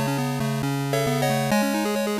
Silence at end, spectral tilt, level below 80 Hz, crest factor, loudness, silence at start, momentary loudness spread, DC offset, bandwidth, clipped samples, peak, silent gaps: 0 s; -5.5 dB/octave; -54 dBFS; 12 dB; -23 LUFS; 0 s; 4 LU; under 0.1%; 15.5 kHz; under 0.1%; -12 dBFS; none